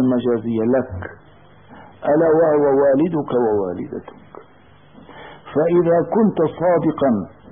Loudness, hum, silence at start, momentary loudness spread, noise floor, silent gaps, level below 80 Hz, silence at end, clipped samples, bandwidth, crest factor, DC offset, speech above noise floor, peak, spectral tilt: -18 LUFS; none; 0 s; 15 LU; -49 dBFS; none; -52 dBFS; 0.25 s; under 0.1%; 3.7 kHz; 12 dB; 0.2%; 32 dB; -6 dBFS; -13 dB/octave